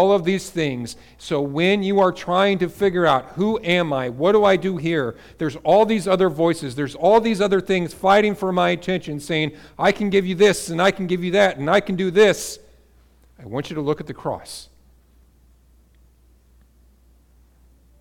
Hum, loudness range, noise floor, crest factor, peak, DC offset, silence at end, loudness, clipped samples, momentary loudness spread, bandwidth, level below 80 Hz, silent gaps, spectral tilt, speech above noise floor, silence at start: none; 13 LU; -54 dBFS; 14 dB; -6 dBFS; under 0.1%; 3.35 s; -20 LUFS; under 0.1%; 12 LU; 17 kHz; -52 dBFS; none; -5.5 dB/octave; 35 dB; 0 s